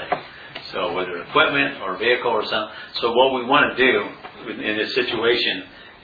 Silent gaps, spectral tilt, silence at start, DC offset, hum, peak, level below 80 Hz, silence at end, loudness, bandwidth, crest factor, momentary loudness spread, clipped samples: none; -5.5 dB/octave; 0 s; under 0.1%; none; -2 dBFS; -56 dBFS; 0.1 s; -20 LUFS; 5 kHz; 20 dB; 14 LU; under 0.1%